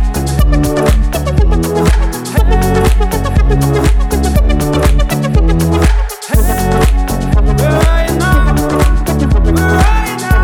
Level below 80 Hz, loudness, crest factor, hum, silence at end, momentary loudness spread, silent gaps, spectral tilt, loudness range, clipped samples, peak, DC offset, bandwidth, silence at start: -12 dBFS; -12 LUFS; 10 dB; none; 0 s; 3 LU; none; -6 dB/octave; 1 LU; under 0.1%; 0 dBFS; under 0.1%; 18.5 kHz; 0 s